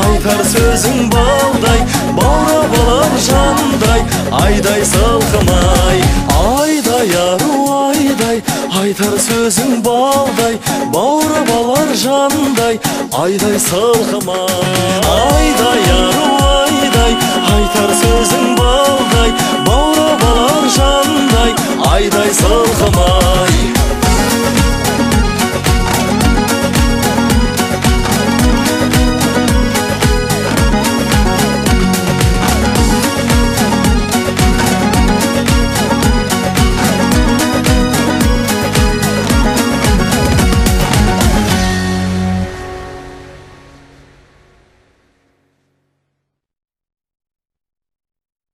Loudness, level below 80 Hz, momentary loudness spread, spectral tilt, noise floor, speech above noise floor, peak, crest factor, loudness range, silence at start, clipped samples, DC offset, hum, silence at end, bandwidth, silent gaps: -11 LUFS; -20 dBFS; 3 LU; -4.5 dB/octave; -72 dBFS; 62 dB; 0 dBFS; 12 dB; 2 LU; 0 s; under 0.1%; under 0.1%; none; 5.15 s; 16 kHz; none